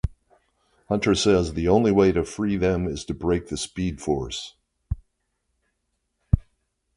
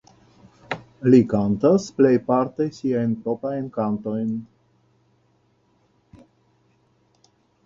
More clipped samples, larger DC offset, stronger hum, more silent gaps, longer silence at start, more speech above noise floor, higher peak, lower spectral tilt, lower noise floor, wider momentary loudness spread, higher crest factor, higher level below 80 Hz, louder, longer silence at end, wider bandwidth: neither; neither; neither; neither; second, 0.05 s vs 0.7 s; first, 53 dB vs 43 dB; about the same, -4 dBFS vs -4 dBFS; second, -6 dB/octave vs -8 dB/octave; first, -76 dBFS vs -63 dBFS; first, 15 LU vs 12 LU; about the same, 22 dB vs 20 dB; first, -36 dBFS vs -58 dBFS; about the same, -23 LUFS vs -21 LUFS; second, 0.55 s vs 3.2 s; first, 11.5 kHz vs 7.6 kHz